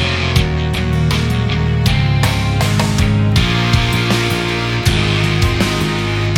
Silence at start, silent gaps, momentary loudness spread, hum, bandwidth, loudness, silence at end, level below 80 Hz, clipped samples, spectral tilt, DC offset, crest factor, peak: 0 s; none; 3 LU; none; 16.5 kHz; -15 LUFS; 0 s; -24 dBFS; under 0.1%; -5.5 dB/octave; under 0.1%; 14 dB; 0 dBFS